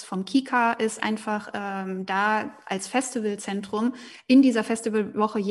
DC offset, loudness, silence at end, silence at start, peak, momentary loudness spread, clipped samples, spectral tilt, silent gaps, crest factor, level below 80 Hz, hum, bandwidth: under 0.1%; -25 LUFS; 0 s; 0 s; -8 dBFS; 12 LU; under 0.1%; -4.5 dB/octave; none; 16 dB; -72 dBFS; none; 12 kHz